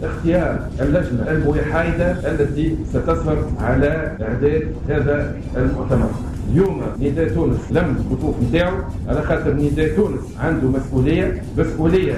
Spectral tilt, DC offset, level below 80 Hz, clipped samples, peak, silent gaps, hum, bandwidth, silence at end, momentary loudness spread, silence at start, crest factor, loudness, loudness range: -8.5 dB/octave; under 0.1%; -28 dBFS; under 0.1%; -6 dBFS; none; none; 12 kHz; 0 s; 4 LU; 0 s; 12 dB; -19 LUFS; 1 LU